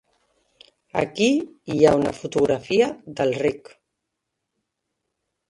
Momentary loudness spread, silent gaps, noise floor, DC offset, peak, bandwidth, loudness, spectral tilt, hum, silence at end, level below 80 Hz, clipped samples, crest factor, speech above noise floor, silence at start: 9 LU; none; -80 dBFS; under 0.1%; -2 dBFS; 11.5 kHz; -22 LUFS; -5.5 dB/octave; none; 1.9 s; -56 dBFS; under 0.1%; 22 dB; 59 dB; 0.95 s